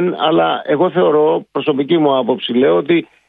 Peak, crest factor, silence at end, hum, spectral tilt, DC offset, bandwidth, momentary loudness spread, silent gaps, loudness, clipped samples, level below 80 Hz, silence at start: -2 dBFS; 12 dB; 0.25 s; none; -9.5 dB/octave; under 0.1%; 4.1 kHz; 4 LU; none; -14 LUFS; under 0.1%; -64 dBFS; 0 s